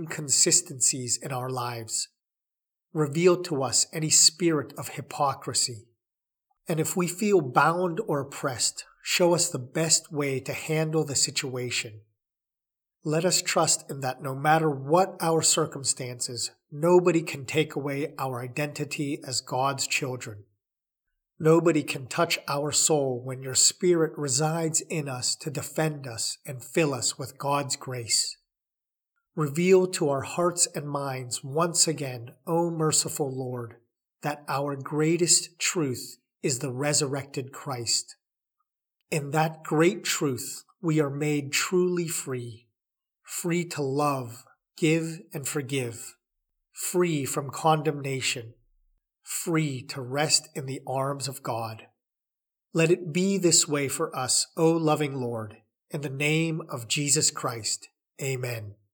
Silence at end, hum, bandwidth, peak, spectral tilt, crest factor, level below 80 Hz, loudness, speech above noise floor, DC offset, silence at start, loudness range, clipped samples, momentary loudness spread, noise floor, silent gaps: 0.2 s; none; over 20 kHz; -4 dBFS; -3.5 dB/octave; 22 dB; -78 dBFS; -26 LUFS; 63 dB; under 0.1%; 0 s; 5 LU; under 0.1%; 13 LU; -90 dBFS; none